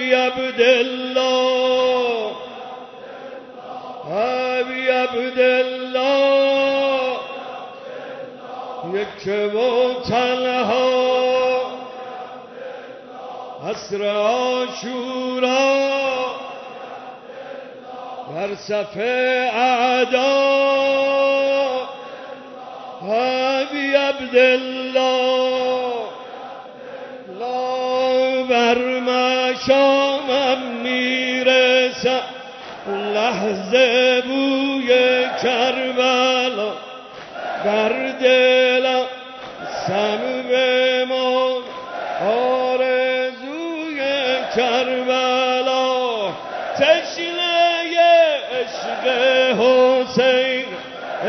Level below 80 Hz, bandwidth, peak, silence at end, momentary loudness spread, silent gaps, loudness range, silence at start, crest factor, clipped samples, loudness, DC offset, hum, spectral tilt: -64 dBFS; 6.4 kHz; -2 dBFS; 0 s; 19 LU; none; 6 LU; 0 s; 16 dB; under 0.1%; -18 LUFS; under 0.1%; none; -3.5 dB/octave